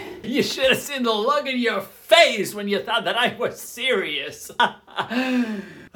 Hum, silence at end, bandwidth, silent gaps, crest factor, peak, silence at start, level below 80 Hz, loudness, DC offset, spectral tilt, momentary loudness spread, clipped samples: none; 0.05 s; 19 kHz; none; 22 dB; 0 dBFS; 0 s; -62 dBFS; -21 LUFS; under 0.1%; -3 dB/octave; 12 LU; under 0.1%